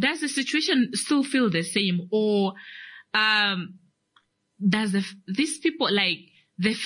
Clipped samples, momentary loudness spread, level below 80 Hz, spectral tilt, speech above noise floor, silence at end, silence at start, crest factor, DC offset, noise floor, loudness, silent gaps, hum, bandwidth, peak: under 0.1%; 9 LU; -70 dBFS; -4 dB/octave; 42 dB; 0 s; 0 s; 16 dB; under 0.1%; -66 dBFS; -24 LUFS; none; none; 11 kHz; -8 dBFS